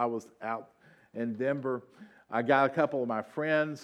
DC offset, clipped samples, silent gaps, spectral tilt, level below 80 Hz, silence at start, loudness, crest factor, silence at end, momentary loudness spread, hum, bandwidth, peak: under 0.1%; under 0.1%; none; -7 dB/octave; -86 dBFS; 0 s; -31 LUFS; 20 dB; 0 s; 12 LU; none; 11.5 kHz; -10 dBFS